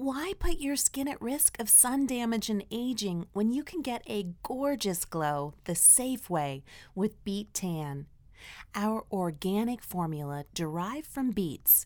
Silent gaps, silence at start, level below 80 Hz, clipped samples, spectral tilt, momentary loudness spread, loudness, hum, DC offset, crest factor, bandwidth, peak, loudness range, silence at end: none; 0 s; -46 dBFS; under 0.1%; -3.5 dB/octave; 17 LU; -28 LUFS; none; under 0.1%; 22 dB; over 20 kHz; -8 dBFS; 8 LU; 0 s